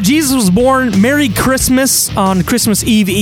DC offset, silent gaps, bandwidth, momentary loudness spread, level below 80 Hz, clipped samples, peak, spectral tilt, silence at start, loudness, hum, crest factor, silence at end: under 0.1%; none; 17 kHz; 2 LU; -30 dBFS; under 0.1%; 0 dBFS; -4 dB/octave; 0 s; -11 LUFS; none; 10 dB; 0 s